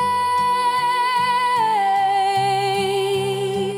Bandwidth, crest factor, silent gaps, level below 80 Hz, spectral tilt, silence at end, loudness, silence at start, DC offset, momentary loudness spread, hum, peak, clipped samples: 16.5 kHz; 10 dB; none; -66 dBFS; -4 dB/octave; 0 s; -19 LUFS; 0 s; under 0.1%; 3 LU; none; -10 dBFS; under 0.1%